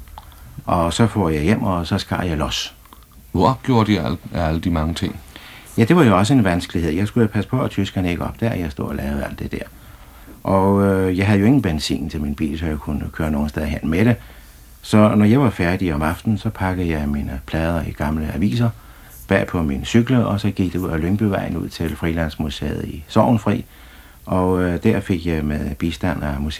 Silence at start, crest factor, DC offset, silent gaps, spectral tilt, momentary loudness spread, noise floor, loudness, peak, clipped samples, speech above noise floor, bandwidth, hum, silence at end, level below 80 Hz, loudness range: 0 s; 18 dB; under 0.1%; none; -6.5 dB/octave; 10 LU; -44 dBFS; -19 LUFS; 0 dBFS; under 0.1%; 25 dB; 15 kHz; none; 0 s; -34 dBFS; 4 LU